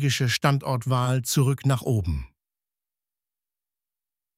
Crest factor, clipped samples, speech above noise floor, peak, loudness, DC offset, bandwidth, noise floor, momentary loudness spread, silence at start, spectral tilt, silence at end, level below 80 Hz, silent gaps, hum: 22 dB; under 0.1%; over 67 dB; -4 dBFS; -24 LUFS; under 0.1%; 16 kHz; under -90 dBFS; 4 LU; 0 s; -5 dB/octave; 2.1 s; -44 dBFS; none; none